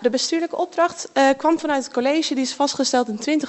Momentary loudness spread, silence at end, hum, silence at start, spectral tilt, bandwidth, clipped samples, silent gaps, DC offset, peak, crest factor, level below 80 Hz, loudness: 5 LU; 0 s; none; 0 s; -2.5 dB/octave; 8.4 kHz; under 0.1%; none; under 0.1%; -6 dBFS; 14 dB; -68 dBFS; -20 LUFS